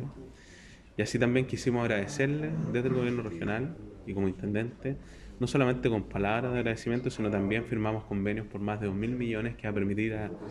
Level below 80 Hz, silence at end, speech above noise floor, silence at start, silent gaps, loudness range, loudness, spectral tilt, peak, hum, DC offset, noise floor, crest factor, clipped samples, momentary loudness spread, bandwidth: -52 dBFS; 0 s; 22 dB; 0 s; none; 2 LU; -31 LUFS; -6.5 dB/octave; -12 dBFS; none; under 0.1%; -52 dBFS; 18 dB; under 0.1%; 11 LU; 12 kHz